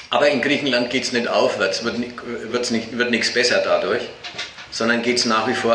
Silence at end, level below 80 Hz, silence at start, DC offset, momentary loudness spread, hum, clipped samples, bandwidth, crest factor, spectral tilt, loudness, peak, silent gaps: 0 s; -58 dBFS; 0 s; under 0.1%; 12 LU; none; under 0.1%; 10.5 kHz; 16 dB; -3 dB/octave; -20 LUFS; -4 dBFS; none